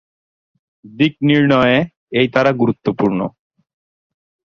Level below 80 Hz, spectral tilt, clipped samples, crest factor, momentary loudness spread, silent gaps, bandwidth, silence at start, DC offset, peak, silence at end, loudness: -52 dBFS; -7.5 dB/octave; under 0.1%; 16 dB; 7 LU; 1.97-2.07 s; 6.8 kHz; 0.85 s; under 0.1%; -2 dBFS; 1.2 s; -15 LUFS